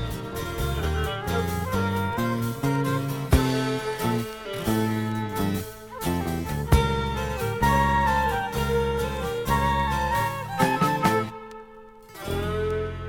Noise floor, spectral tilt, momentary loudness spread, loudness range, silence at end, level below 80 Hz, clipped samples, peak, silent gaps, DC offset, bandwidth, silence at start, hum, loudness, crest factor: -46 dBFS; -6 dB/octave; 10 LU; 3 LU; 0 s; -34 dBFS; under 0.1%; -4 dBFS; none; under 0.1%; 18 kHz; 0 s; none; -25 LUFS; 22 dB